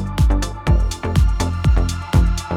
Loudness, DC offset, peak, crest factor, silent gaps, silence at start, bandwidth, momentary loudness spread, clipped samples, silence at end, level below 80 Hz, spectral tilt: -19 LUFS; under 0.1%; -2 dBFS; 14 dB; none; 0 s; 13.5 kHz; 2 LU; under 0.1%; 0 s; -18 dBFS; -6 dB/octave